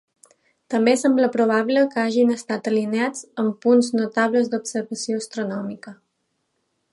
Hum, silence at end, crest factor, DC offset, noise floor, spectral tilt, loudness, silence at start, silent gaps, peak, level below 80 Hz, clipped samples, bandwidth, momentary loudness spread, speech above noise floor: none; 1 s; 18 dB; under 0.1%; -73 dBFS; -4.5 dB/octave; -21 LUFS; 0.7 s; none; -4 dBFS; -76 dBFS; under 0.1%; 11.5 kHz; 10 LU; 53 dB